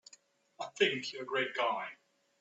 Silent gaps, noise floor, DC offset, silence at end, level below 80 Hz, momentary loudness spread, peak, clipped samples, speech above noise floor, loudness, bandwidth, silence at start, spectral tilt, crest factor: none; -64 dBFS; under 0.1%; 0.45 s; -86 dBFS; 15 LU; -14 dBFS; under 0.1%; 31 dB; -34 LUFS; 8.2 kHz; 0.6 s; -3 dB/octave; 22 dB